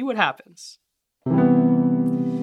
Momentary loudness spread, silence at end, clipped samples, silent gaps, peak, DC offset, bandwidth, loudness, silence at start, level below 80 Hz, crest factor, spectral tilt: 18 LU; 0 s; under 0.1%; none; -2 dBFS; under 0.1%; 9.2 kHz; -20 LUFS; 0 s; -62 dBFS; 18 dB; -7.5 dB/octave